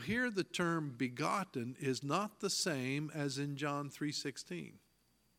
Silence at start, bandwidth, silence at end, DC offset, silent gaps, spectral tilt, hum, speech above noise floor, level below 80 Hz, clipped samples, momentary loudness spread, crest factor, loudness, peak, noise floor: 0 s; 16.5 kHz; 0.6 s; under 0.1%; none; -4 dB/octave; none; 36 dB; -74 dBFS; under 0.1%; 7 LU; 20 dB; -38 LUFS; -20 dBFS; -75 dBFS